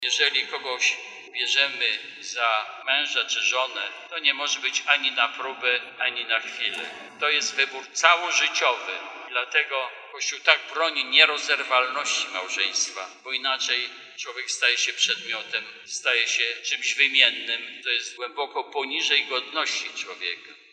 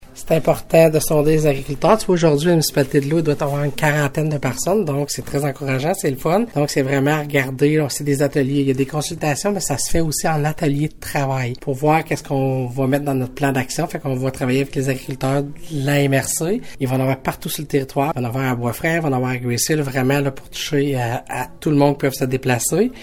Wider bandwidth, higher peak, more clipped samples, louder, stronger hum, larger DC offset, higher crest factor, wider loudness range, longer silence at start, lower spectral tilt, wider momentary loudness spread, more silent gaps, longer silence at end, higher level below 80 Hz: second, 11 kHz vs 17.5 kHz; about the same, -2 dBFS vs -2 dBFS; neither; second, -23 LUFS vs -19 LUFS; neither; neither; first, 24 dB vs 18 dB; about the same, 3 LU vs 4 LU; about the same, 0 s vs 0 s; second, 2.5 dB/octave vs -5.5 dB/octave; first, 12 LU vs 7 LU; neither; first, 0.15 s vs 0 s; second, under -90 dBFS vs -40 dBFS